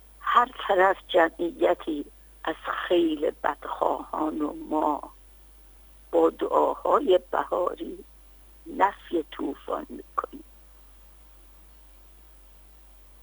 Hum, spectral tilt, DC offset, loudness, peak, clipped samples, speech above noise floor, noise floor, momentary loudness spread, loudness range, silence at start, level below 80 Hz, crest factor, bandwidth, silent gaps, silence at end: 50 Hz at -55 dBFS; -5 dB/octave; under 0.1%; -26 LUFS; -6 dBFS; under 0.1%; 26 dB; -51 dBFS; 13 LU; 12 LU; 0.2 s; -54 dBFS; 22 dB; over 20 kHz; none; 2.8 s